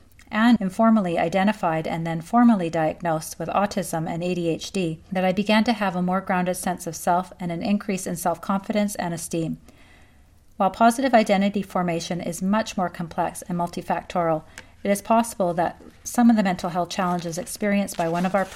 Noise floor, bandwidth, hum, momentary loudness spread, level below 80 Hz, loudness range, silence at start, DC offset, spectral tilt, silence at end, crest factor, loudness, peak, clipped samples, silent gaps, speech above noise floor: -53 dBFS; 15.5 kHz; none; 9 LU; -54 dBFS; 4 LU; 0.3 s; under 0.1%; -5.5 dB/octave; 0 s; 20 dB; -23 LUFS; -4 dBFS; under 0.1%; none; 30 dB